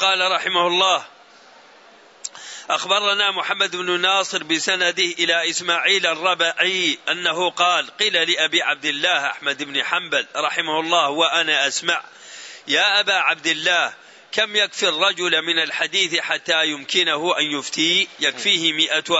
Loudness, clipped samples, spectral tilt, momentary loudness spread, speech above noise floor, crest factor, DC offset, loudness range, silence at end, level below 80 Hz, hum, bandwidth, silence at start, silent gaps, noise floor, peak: -18 LUFS; under 0.1%; -1 dB/octave; 6 LU; 28 dB; 18 dB; under 0.1%; 2 LU; 0 s; -76 dBFS; none; 8.2 kHz; 0 s; none; -48 dBFS; -4 dBFS